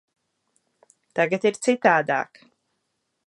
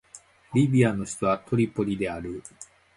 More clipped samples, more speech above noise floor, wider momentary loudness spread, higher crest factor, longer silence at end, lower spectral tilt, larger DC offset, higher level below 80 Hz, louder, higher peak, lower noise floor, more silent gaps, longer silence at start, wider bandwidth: neither; first, 54 dB vs 27 dB; second, 11 LU vs 15 LU; about the same, 22 dB vs 20 dB; first, 1 s vs 0.3 s; second, -4.5 dB/octave vs -7 dB/octave; neither; second, -78 dBFS vs -54 dBFS; first, -22 LUFS vs -25 LUFS; first, -2 dBFS vs -8 dBFS; first, -76 dBFS vs -52 dBFS; neither; first, 1.15 s vs 0.15 s; about the same, 11.5 kHz vs 11.5 kHz